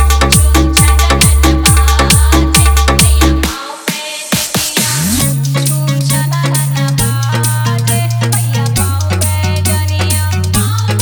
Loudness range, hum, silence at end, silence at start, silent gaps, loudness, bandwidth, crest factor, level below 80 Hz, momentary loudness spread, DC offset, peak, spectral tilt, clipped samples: 4 LU; none; 0 s; 0 s; none; -11 LUFS; over 20 kHz; 10 dB; -16 dBFS; 5 LU; under 0.1%; 0 dBFS; -4 dB/octave; 0.1%